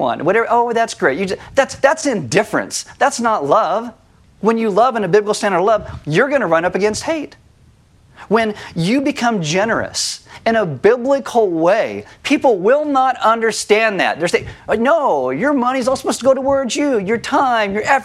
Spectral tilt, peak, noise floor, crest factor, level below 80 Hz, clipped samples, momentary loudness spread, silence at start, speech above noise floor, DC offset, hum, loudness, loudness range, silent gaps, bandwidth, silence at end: -4.5 dB/octave; 0 dBFS; -49 dBFS; 16 dB; -50 dBFS; under 0.1%; 6 LU; 0 s; 34 dB; under 0.1%; none; -16 LUFS; 3 LU; none; 14.5 kHz; 0 s